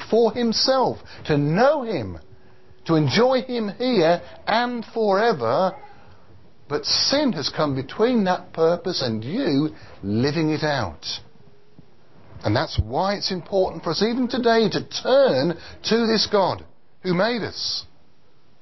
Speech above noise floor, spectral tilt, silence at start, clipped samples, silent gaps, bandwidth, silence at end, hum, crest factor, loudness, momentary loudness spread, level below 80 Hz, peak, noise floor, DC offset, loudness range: 39 dB; -5.5 dB/octave; 0 s; under 0.1%; none; 6.2 kHz; 0.8 s; none; 16 dB; -22 LUFS; 10 LU; -46 dBFS; -6 dBFS; -60 dBFS; 0.6%; 5 LU